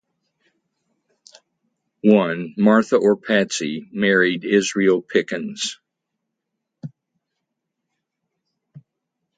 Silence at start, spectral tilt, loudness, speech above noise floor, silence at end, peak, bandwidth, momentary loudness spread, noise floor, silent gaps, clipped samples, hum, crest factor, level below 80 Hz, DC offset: 2.05 s; -5 dB/octave; -19 LUFS; 62 dB; 0.6 s; -2 dBFS; 9.4 kHz; 11 LU; -80 dBFS; none; under 0.1%; none; 20 dB; -68 dBFS; under 0.1%